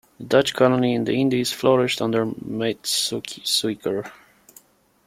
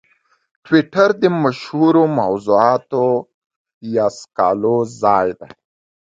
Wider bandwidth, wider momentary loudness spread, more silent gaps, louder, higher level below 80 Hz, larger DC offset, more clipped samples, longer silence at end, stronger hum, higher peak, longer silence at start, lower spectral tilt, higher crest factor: first, 16.5 kHz vs 7.8 kHz; about the same, 9 LU vs 8 LU; second, none vs 3.34-3.50 s, 3.56-3.65 s, 3.74-3.81 s; second, -21 LUFS vs -16 LUFS; about the same, -62 dBFS vs -58 dBFS; neither; neither; first, 0.95 s vs 0.6 s; neither; second, -4 dBFS vs 0 dBFS; second, 0.2 s vs 0.7 s; second, -4 dB/octave vs -7 dB/octave; about the same, 20 dB vs 16 dB